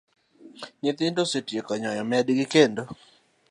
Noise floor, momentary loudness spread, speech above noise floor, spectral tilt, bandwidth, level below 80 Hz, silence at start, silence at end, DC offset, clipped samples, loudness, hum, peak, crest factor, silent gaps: -45 dBFS; 21 LU; 21 dB; -4.5 dB/octave; 11 kHz; -72 dBFS; 0.45 s; 0.6 s; under 0.1%; under 0.1%; -25 LUFS; none; -4 dBFS; 22 dB; none